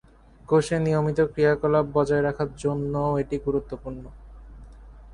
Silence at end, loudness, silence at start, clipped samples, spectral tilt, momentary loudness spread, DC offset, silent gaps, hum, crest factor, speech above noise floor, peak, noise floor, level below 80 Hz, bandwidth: 0 s; -24 LUFS; 0.5 s; under 0.1%; -7.5 dB/octave; 10 LU; under 0.1%; none; none; 16 dB; 21 dB; -8 dBFS; -45 dBFS; -46 dBFS; 11 kHz